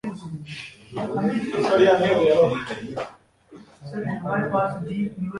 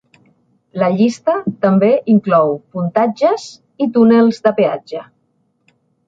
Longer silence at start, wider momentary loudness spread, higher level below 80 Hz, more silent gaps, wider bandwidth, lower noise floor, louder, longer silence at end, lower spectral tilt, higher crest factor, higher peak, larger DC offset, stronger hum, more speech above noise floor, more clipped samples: second, 0.05 s vs 0.75 s; first, 18 LU vs 13 LU; about the same, -58 dBFS vs -62 dBFS; neither; first, 11.5 kHz vs 7.8 kHz; second, -49 dBFS vs -63 dBFS; second, -22 LUFS vs -14 LUFS; second, 0 s vs 1.05 s; about the same, -6.5 dB/octave vs -7.5 dB/octave; about the same, 18 dB vs 14 dB; second, -6 dBFS vs -2 dBFS; neither; neither; second, 26 dB vs 49 dB; neither